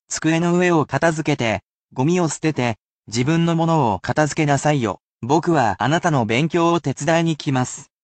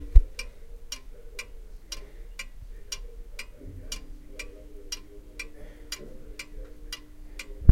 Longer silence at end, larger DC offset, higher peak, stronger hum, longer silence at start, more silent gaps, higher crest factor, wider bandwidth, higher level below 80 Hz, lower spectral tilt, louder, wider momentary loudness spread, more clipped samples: first, 0.2 s vs 0 s; neither; second, -4 dBFS vs 0 dBFS; neither; about the same, 0.1 s vs 0 s; first, 1.65-1.88 s, 2.84-3.03 s, 5.02-5.16 s vs none; second, 16 dB vs 28 dB; second, 9 kHz vs 13.5 kHz; second, -54 dBFS vs -32 dBFS; about the same, -5.5 dB/octave vs -4.5 dB/octave; first, -19 LUFS vs -37 LUFS; about the same, 6 LU vs 7 LU; neither